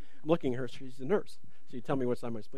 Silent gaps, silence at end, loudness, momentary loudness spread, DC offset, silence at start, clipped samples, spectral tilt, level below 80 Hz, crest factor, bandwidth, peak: none; 0 s; -34 LUFS; 14 LU; 2%; 0.25 s; under 0.1%; -7.5 dB/octave; -66 dBFS; 22 dB; 13 kHz; -12 dBFS